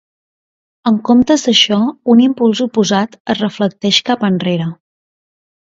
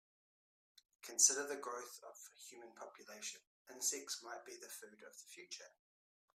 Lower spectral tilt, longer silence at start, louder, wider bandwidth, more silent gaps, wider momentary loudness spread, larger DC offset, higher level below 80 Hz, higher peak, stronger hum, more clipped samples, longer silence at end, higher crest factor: first, -4.5 dB/octave vs 1.5 dB/octave; second, 0.85 s vs 1.05 s; first, -13 LUFS vs -38 LUFS; second, 7.8 kHz vs 15.5 kHz; second, 3.20-3.25 s vs 3.47-3.65 s; second, 8 LU vs 25 LU; neither; first, -54 dBFS vs under -90 dBFS; first, 0 dBFS vs -16 dBFS; neither; neither; first, 1.05 s vs 0.65 s; second, 14 dB vs 30 dB